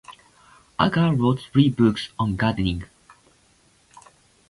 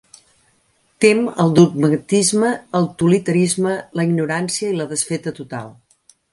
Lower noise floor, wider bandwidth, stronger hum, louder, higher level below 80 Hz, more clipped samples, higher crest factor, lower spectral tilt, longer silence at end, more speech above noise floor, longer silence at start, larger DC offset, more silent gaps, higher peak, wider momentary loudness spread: about the same, -59 dBFS vs -61 dBFS; about the same, 11.5 kHz vs 11.5 kHz; neither; second, -22 LUFS vs -17 LUFS; first, -44 dBFS vs -58 dBFS; neither; about the same, 20 dB vs 18 dB; first, -7.5 dB/octave vs -5 dB/octave; first, 1.65 s vs 0.6 s; second, 39 dB vs 44 dB; second, 0.1 s vs 1 s; neither; neither; second, -4 dBFS vs 0 dBFS; second, 8 LU vs 12 LU